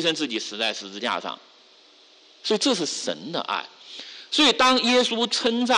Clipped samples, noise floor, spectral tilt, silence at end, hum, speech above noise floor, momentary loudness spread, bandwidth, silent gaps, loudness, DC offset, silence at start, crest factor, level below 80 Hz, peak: under 0.1%; -54 dBFS; -2 dB/octave; 0 s; none; 30 dB; 19 LU; 11.5 kHz; none; -22 LUFS; under 0.1%; 0 s; 16 dB; -66 dBFS; -10 dBFS